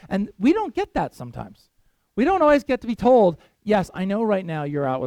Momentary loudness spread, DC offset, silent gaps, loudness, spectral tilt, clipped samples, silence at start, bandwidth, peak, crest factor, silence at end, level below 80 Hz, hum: 17 LU; under 0.1%; none; -21 LUFS; -7.5 dB/octave; under 0.1%; 0.05 s; 14 kHz; -6 dBFS; 16 dB; 0 s; -48 dBFS; none